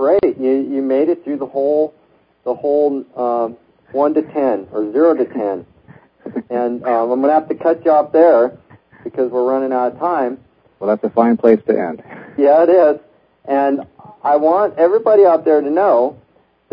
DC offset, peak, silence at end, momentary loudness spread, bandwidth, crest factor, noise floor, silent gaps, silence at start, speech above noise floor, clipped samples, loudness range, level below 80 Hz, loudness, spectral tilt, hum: under 0.1%; 0 dBFS; 0.6 s; 13 LU; 5.2 kHz; 16 dB; -46 dBFS; none; 0 s; 31 dB; under 0.1%; 4 LU; -60 dBFS; -15 LUFS; -10 dB/octave; none